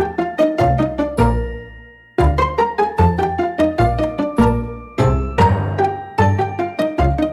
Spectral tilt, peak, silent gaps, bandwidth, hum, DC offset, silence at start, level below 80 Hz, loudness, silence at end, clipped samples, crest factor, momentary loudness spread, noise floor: -8 dB/octave; -2 dBFS; none; 12.5 kHz; none; under 0.1%; 0 s; -26 dBFS; -17 LUFS; 0 s; under 0.1%; 14 dB; 6 LU; -40 dBFS